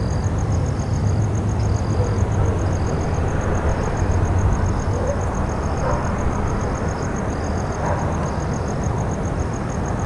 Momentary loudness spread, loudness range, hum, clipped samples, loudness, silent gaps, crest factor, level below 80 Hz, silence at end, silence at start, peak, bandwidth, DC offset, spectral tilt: 4 LU; 2 LU; none; under 0.1%; -22 LUFS; none; 14 dB; -28 dBFS; 0 s; 0 s; -6 dBFS; 11 kHz; under 0.1%; -7 dB/octave